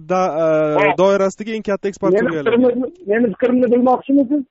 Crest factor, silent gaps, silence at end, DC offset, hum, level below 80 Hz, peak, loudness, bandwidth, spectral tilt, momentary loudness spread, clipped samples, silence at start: 14 dB; none; 0.05 s; under 0.1%; none; -56 dBFS; -2 dBFS; -16 LUFS; 8 kHz; -5.5 dB/octave; 7 LU; under 0.1%; 0 s